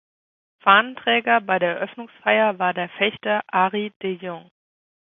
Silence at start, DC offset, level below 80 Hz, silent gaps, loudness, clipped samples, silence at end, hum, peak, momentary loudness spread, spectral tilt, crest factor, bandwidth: 0.65 s; under 0.1%; -70 dBFS; 3.96-4.00 s; -20 LUFS; under 0.1%; 0.75 s; none; 0 dBFS; 13 LU; -7.5 dB/octave; 22 dB; 4 kHz